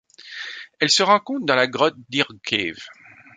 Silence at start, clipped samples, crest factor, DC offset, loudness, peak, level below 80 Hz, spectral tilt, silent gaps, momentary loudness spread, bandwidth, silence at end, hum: 0.25 s; under 0.1%; 20 dB; under 0.1%; -20 LUFS; -2 dBFS; -64 dBFS; -2.5 dB/octave; none; 18 LU; 9.6 kHz; 0.45 s; none